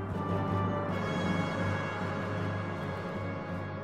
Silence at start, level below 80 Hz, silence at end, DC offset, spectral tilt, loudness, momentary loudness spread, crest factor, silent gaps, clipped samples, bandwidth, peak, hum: 0 s; -56 dBFS; 0 s; 0.1%; -7 dB/octave; -33 LUFS; 5 LU; 14 dB; none; under 0.1%; 10 kHz; -20 dBFS; none